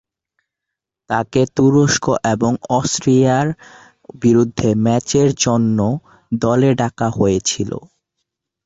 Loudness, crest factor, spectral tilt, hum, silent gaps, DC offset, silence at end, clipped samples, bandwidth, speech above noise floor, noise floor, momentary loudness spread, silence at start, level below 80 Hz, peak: -16 LUFS; 14 dB; -5.5 dB/octave; none; none; under 0.1%; 0.8 s; under 0.1%; 8.2 kHz; 67 dB; -82 dBFS; 9 LU; 1.1 s; -46 dBFS; -2 dBFS